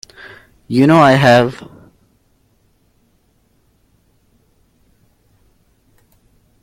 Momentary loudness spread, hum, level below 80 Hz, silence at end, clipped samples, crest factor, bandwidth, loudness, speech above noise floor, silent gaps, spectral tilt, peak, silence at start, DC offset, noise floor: 28 LU; none; -52 dBFS; 5 s; under 0.1%; 18 dB; 16 kHz; -11 LUFS; 48 dB; none; -6.5 dB/octave; 0 dBFS; 0.7 s; under 0.1%; -58 dBFS